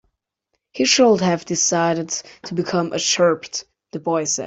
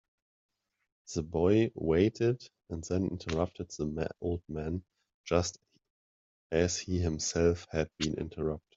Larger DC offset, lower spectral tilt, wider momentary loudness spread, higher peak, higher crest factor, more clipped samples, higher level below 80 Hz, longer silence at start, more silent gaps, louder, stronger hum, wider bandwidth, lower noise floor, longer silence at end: neither; second, -3 dB/octave vs -5.5 dB/octave; first, 15 LU vs 11 LU; first, -4 dBFS vs -12 dBFS; about the same, 18 dB vs 20 dB; neither; second, -62 dBFS vs -54 dBFS; second, 0.75 s vs 1.1 s; second, none vs 5.14-5.24 s, 5.90-6.50 s; first, -19 LUFS vs -32 LUFS; neither; about the same, 8.4 kHz vs 8 kHz; second, -75 dBFS vs under -90 dBFS; second, 0 s vs 0.15 s